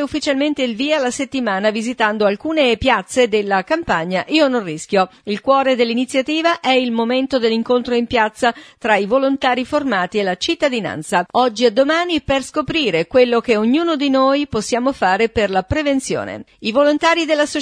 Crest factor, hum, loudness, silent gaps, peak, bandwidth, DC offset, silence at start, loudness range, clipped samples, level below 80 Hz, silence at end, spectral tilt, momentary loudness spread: 16 dB; none; -17 LUFS; none; 0 dBFS; 11 kHz; under 0.1%; 0 s; 1 LU; under 0.1%; -46 dBFS; 0 s; -4 dB/octave; 5 LU